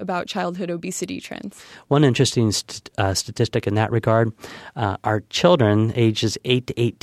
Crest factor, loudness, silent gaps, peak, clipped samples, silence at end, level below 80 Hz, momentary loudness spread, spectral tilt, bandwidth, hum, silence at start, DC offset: 18 dB; -21 LUFS; none; -2 dBFS; under 0.1%; 0.1 s; -54 dBFS; 14 LU; -5.5 dB/octave; 14 kHz; none; 0 s; under 0.1%